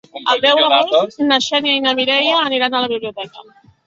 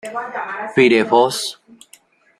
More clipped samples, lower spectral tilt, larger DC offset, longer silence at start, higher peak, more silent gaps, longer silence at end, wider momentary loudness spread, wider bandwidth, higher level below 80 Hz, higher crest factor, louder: neither; second, -2.5 dB/octave vs -4 dB/octave; neither; about the same, 0.15 s vs 0.05 s; about the same, 0 dBFS vs -2 dBFS; neither; second, 0.45 s vs 0.85 s; about the same, 11 LU vs 13 LU; second, 7.8 kHz vs 14.5 kHz; about the same, -62 dBFS vs -64 dBFS; about the same, 16 dB vs 18 dB; first, -14 LUFS vs -17 LUFS